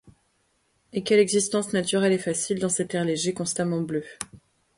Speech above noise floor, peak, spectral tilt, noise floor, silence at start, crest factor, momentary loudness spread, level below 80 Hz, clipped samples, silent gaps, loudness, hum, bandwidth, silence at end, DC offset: 45 dB; -8 dBFS; -4 dB/octave; -69 dBFS; 0.95 s; 18 dB; 12 LU; -64 dBFS; under 0.1%; none; -25 LUFS; none; 11.5 kHz; 0.4 s; under 0.1%